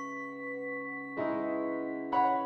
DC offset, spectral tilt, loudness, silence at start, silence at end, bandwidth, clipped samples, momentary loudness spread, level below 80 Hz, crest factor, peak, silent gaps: under 0.1%; -6.5 dB/octave; -34 LUFS; 0 s; 0 s; 6.4 kHz; under 0.1%; 9 LU; -74 dBFS; 16 dB; -16 dBFS; none